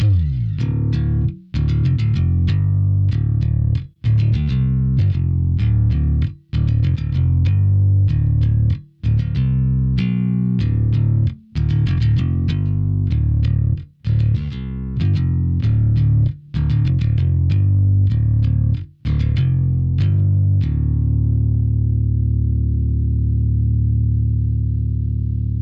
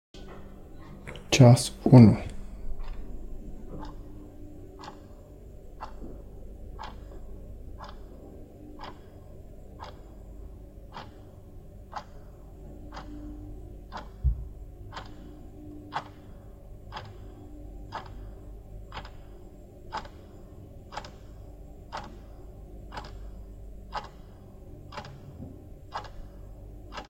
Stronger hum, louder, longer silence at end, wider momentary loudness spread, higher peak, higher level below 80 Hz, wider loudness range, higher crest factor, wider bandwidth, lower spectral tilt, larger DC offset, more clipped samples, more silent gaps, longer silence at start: neither; first, -18 LUFS vs -24 LUFS; about the same, 0 s vs 0.05 s; second, 5 LU vs 17 LU; second, -10 dBFS vs -4 dBFS; first, -24 dBFS vs -44 dBFS; second, 2 LU vs 24 LU; second, 8 dB vs 28 dB; second, 5.2 kHz vs 13.5 kHz; first, -10 dB/octave vs -6.5 dB/octave; neither; neither; neither; second, 0 s vs 0.15 s